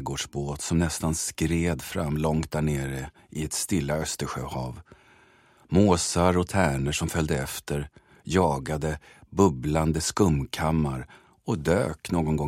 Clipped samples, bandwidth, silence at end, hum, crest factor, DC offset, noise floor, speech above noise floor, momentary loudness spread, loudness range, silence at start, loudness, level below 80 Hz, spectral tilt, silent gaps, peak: under 0.1%; 16 kHz; 0 s; none; 20 dB; under 0.1%; -58 dBFS; 32 dB; 12 LU; 3 LU; 0 s; -26 LUFS; -42 dBFS; -5 dB/octave; none; -6 dBFS